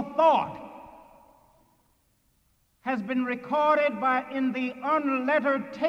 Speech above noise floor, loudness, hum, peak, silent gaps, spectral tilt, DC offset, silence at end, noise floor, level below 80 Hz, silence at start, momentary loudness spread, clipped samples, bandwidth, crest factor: 42 dB; -26 LUFS; none; -10 dBFS; none; -6.5 dB/octave; under 0.1%; 0 s; -68 dBFS; -70 dBFS; 0 s; 14 LU; under 0.1%; 8.6 kHz; 18 dB